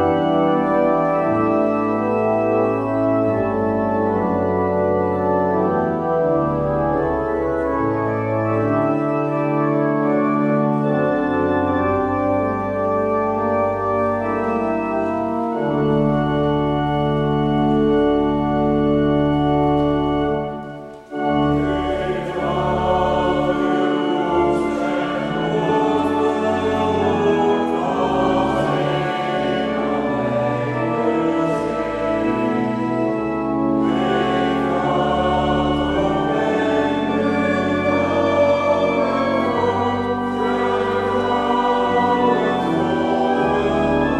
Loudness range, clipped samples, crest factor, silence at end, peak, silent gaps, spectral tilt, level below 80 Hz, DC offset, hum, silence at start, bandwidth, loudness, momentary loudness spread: 2 LU; under 0.1%; 14 dB; 0 s; -6 dBFS; none; -7.5 dB/octave; -42 dBFS; under 0.1%; none; 0 s; 10 kHz; -19 LUFS; 4 LU